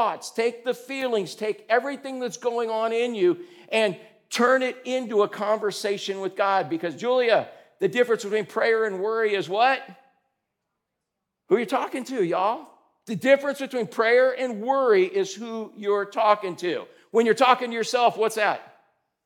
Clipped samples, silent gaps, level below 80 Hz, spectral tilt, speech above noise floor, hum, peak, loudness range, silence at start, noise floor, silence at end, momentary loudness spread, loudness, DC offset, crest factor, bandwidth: under 0.1%; none; under -90 dBFS; -4 dB/octave; 59 dB; none; -4 dBFS; 4 LU; 0 s; -82 dBFS; 0.6 s; 9 LU; -24 LUFS; under 0.1%; 22 dB; 17 kHz